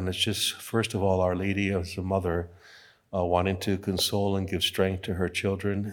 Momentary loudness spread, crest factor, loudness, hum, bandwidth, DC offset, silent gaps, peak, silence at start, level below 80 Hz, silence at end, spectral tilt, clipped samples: 5 LU; 18 dB; -27 LUFS; none; 19 kHz; under 0.1%; none; -10 dBFS; 0 s; -56 dBFS; 0 s; -4.5 dB/octave; under 0.1%